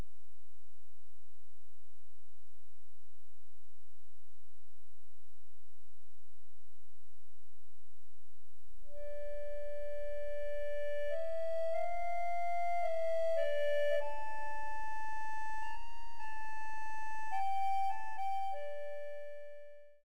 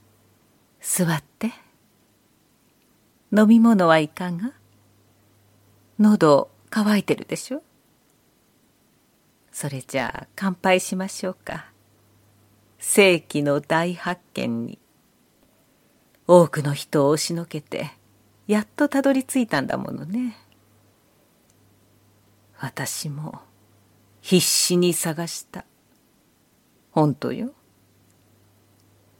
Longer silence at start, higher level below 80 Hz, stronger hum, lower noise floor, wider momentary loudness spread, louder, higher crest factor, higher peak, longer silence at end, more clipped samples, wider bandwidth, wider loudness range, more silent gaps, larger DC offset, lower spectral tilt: second, 0 s vs 0.85 s; about the same, -62 dBFS vs -66 dBFS; neither; first, -74 dBFS vs -62 dBFS; second, 14 LU vs 18 LU; second, -40 LUFS vs -22 LUFS; second, 14 dB vs 24 dB; second, -22 dBFS vs 0 dBFS; second, 0 s vs 1.7 s; neither; about the same, 16 kHz vs 17 kHz; about the same, 12 LU vs 10 LU; neither; first, 3% vs under 0.1%; about the same, -4.5 dB/octave vs -4.5 dB/octave